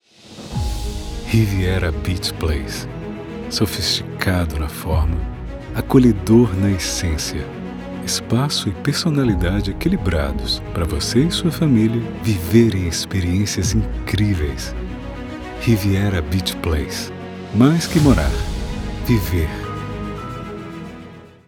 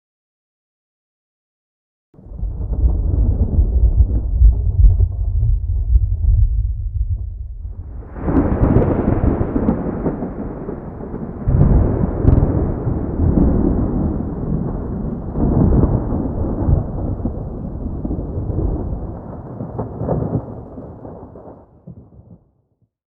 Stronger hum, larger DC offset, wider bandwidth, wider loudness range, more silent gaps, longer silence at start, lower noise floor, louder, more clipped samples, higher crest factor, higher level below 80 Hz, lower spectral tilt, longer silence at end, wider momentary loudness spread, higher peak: neither; neither; first, 19.5 kHz vs 2.5 kHz; second, 4 LU vs 8 LU; neither; second, 0.25 s vs 2.25 s; second, -39 dBFS vs -63 dBFS; about the same, -19 LUFS vs -19 LUFS; neither; about the same, 18 dB vs 16 dB; second, -28 dBFS vs -20 dBFS; second, -5.5 dB/octave vs -14 dB/octave; second, 0.2 s vs 0.8 s; about the same, 15 LU vs 15 LU; about the same, 0 dBFS vs 0 dBFS